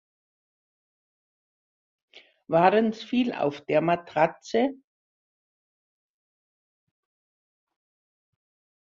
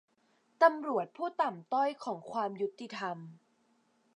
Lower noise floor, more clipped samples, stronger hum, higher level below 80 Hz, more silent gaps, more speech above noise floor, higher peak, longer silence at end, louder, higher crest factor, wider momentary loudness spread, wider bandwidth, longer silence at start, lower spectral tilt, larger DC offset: first, under -90 dBFS vs -72 dBFS; neither; neither; first, -74 dBFS vs under -90 dBFS; neither; first, over 66 dB vs 39 dB; first, -6 dBFS vs -12 dBFS; first, 4.05 s vs 0.8 s; first, -25 LUFS vs -33 LUFS; about the same, 24 dB vs 22 dB; second, 6 LU vs 13 LU; second, 7.4 kHz vs 10.5 kHz; first, 2.5 s vs 0.6 s; about the same, -6.5 dB/octave vs -5.5 dB/octave; neither